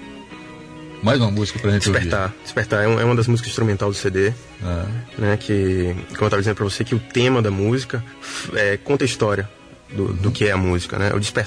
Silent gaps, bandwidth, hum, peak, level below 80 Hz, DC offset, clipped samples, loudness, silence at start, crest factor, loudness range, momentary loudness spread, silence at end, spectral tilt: none; 11 kHz; none; -6 dBFS; -44 dBFS; under 0.1%; under 0.1%; -20 LUFS; 0 s; 14 dB; 2 LU; 12 LU; 0 s; -5.5 dB/octave